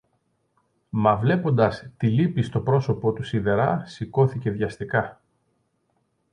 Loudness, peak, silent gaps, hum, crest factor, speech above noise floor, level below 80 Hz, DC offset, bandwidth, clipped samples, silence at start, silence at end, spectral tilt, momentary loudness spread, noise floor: -23 LUFS; -6 dBFS; none; none; 18 dB; 48 dB; -52 dBFS; under 0.1%; 9.8 kHz; under 0.1%; 0.95 s; 1.2 s; -8.5 dB/octave; 7 LU; -71 dBFS